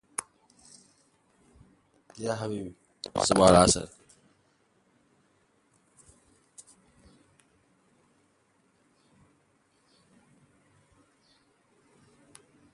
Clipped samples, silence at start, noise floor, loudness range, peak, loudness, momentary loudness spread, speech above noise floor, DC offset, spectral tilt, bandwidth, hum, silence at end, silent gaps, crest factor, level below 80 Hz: under 0.1%; 2.2 s; -69 dBFS; 10 LU; -4 dBFS; -25 LUFS; 31 LU; 45 dB; under 0.1%; -4 dB/octave; 11.5 kHz; none; 8.85 s; none; 30 dB; -54 dBFS